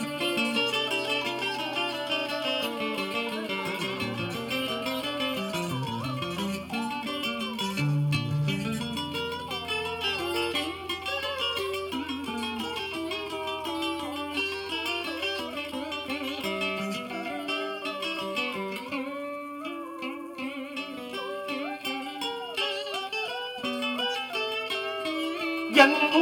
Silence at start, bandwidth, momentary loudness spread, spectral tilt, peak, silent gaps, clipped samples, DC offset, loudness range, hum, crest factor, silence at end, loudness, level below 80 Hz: 0 s; 18 kHz; 7 LU; -4.5 dB/octave; -4 dBFS; none; under 0.1%; under 0.1%; 4 LU; none; 26 dB; 0 s; -29 LUFS; -62 dBFS